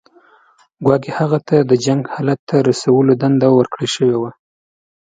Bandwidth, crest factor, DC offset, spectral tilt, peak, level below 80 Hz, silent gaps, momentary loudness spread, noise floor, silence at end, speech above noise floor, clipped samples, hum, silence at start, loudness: 9.4 kHz; 16 dB; under 0.1%; -6.5 dB/octave; 0 dBFS; -56 dBFS; 2.39-2.47 s; 7 LU; -52 dBFS; 0.7 s; 38 dB; under 0.1%; none; 0.8 s; -15 LUFS